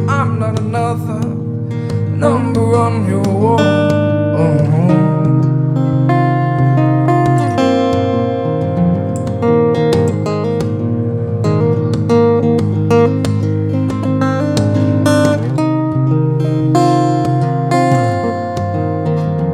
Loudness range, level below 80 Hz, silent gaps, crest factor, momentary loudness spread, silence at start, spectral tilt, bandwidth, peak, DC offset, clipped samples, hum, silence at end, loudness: 2 LU; -48 dBFS; none; 12 dB; 6 LU; 0 s; -8 dB/octave; 11.5 kHz; 0 dBFS; under 0.1%; under 0.1%; none; 0 s; -14 LUFS